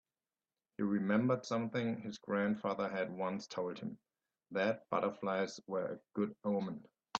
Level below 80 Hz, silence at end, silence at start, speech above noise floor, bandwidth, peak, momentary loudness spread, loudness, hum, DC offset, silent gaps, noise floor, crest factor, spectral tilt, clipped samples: -80 dBFS; 0 s; 0.8 s; over 53 dB; 7.8 kHz; -18 dBFS; 10 LU; -38 LUFS; none; under 0.1%; none; under -90 dBFS; 20 dB; -6.5 dB/octave; under 0.1%